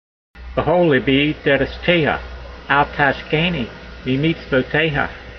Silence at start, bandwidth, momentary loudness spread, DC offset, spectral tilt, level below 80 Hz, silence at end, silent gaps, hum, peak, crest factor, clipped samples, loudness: 0.35 s; 6.4 kHz; 11 LU; under 0.1%; -7.5 dB/octave; -38 dBFS; 0 s; none; none; -2 dBFS; 16 dB; under 0.1%; -18 LUFS